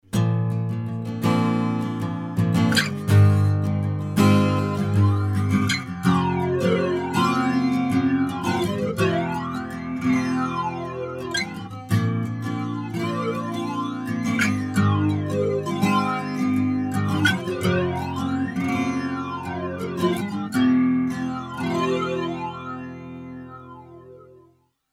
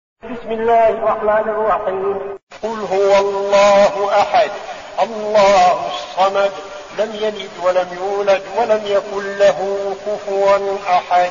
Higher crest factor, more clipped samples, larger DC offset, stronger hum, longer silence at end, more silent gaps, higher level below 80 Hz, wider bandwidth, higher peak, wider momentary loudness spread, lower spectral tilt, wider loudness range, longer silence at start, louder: about the same, 16 dB vs 14 dB; neither; second, under 0.1% vs 0.2%; neither; first, 0.65 s vs 0 s; second, none vs 2.43-2.47 s; about the same, -54 dBFS vs -50 dBFS; first, 15 kHz vs 7.4 kHz; second, -6 dBFS vs -2 dBFS; about the same, 10 LU vs 12 LU; first, -6.5 dB/octave vs -2 dB/octave; about the same, 6 LU vs 4 LU; about the same, 0.15 s vs 0.25 s; second, -23 LUFS vs -16 LUFS